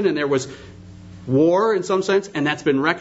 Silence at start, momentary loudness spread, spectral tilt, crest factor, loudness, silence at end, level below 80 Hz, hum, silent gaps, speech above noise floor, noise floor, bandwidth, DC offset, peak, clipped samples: 0 s; 14 LU; -5.5 dB/octave; 18 dB; -19 LUFS; 0 s; -56 dBFS; none; none; 20 dB; -40 dBFS; 8 kHz; under 0.1%; -2 dBFS; under 0.1%